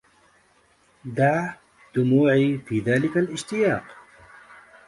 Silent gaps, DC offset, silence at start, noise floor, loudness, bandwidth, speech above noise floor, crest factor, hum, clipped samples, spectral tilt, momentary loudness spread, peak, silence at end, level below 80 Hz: none; under 0.1%; 1.05 s; -61 dBFS; -23 LUFS; 11.5 kHz; 39 dB; 18 dB; none; under 0.1%; -7 dB/octave; 12 LU; -8 dBFS; 0.95 s; -62 dBFS